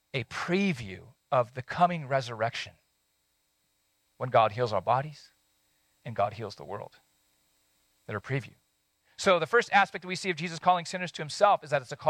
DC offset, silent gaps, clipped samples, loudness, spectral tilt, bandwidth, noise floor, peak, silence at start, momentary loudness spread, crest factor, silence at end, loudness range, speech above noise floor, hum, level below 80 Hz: under 0.1%; none; under 0.1%; -28 LUFS; -5 dB/octave; 16.5 kHz; -74 dBFS; -10 dBFS; 0.15 s; 16 LU; 22 dB; 0 s; 10 LU; 46 dB; none; -68 dBFS